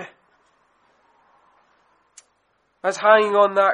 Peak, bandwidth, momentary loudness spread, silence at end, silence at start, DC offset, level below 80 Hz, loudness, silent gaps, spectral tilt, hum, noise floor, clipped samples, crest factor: -2 dBFS; 10 kHz; 14 LU; 0 s; 0 s; under 0.1%; -80 dBFS; -17 LUFS; none; -3.5 dB/octave; none; -67 dBFS; under 0.1%; 20 dB